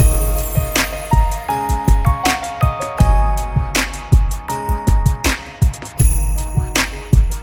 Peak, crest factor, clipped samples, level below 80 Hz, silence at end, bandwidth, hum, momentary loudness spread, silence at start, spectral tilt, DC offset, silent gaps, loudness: 0 dBFS; 14 dB; under 0.1%; -18 dBFS; 0 s; 19.5 kHz; none; 4 LU; 0 s; -4.5 dB/octave; under 0.1%; none; -18 LUFS